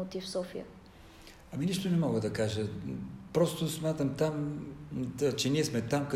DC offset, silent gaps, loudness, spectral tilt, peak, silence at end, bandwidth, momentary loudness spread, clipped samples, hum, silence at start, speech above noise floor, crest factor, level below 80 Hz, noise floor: under 0.1%; none; -33 LUFS; -5.5 dB/octave; -14 dBFS; 0 s; 16 kHz; 13 LU; under 0.1%; none; 0 s; 21 dB; 18 dB; -60 dBFS; -53 dBFS